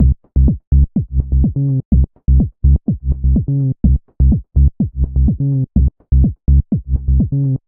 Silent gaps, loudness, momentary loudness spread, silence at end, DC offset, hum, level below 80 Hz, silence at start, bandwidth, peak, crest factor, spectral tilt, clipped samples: 0.67-0.71 s, 1.85-1.91 s; -16 LUFS; 3 LU; 0.1 s; under 0.1%; none; -16 dBFS; 0 s; 0.9 kHz; 0 dBFS; 12 dB; -19.5 dB/octave; under 0.1%